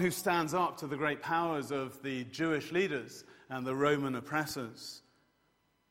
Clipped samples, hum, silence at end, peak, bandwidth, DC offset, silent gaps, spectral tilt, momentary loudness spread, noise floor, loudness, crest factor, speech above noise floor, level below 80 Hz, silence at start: under 0.1%; none; 0.9 s; -14 dBFS; 16 kHz; under 0.1%; none; -5 dB/octave; 14 LU; -74 dBFS; -34 LUFS; 20 dB; 40 dB; -72 dBFS; 0 s